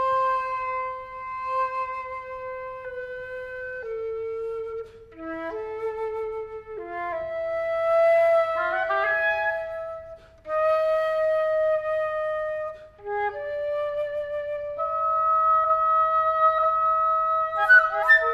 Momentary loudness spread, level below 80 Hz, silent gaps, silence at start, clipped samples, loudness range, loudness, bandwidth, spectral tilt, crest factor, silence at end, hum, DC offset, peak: 15 LU; -58 dBFS; none; 0 s; under 0.1%; 11 LU; -24 LUFS; 12 kHz; -4.5 dB/octave; 18 dB; 0 s; none; under 0.1%; -6 dBFS